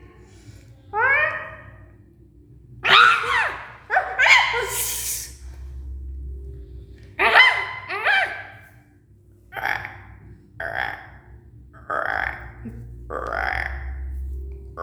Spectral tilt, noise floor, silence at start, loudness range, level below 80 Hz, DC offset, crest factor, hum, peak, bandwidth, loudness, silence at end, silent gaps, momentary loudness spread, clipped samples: -1.5 dB/octave; -53 dBFS; 0 s; 12 LU; -40 dBFS; under 0.1%; 24 dB; none; 0 dBFS; over 20 kHz; -19 LUFS; 0 s; none; 24 LU; under 0.1%